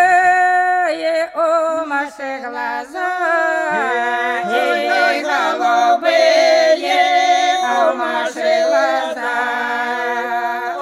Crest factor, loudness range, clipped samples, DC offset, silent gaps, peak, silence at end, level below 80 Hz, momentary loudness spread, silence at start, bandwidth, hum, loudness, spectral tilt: 14 dB; 5 LU; under 0.1%; under 0.1%; none; -2 dBFS; 0 s; -66 dBFS; 9 LU; 0 s; 13.5 kHz; none; -16 LUFS; -1.5 dB/octave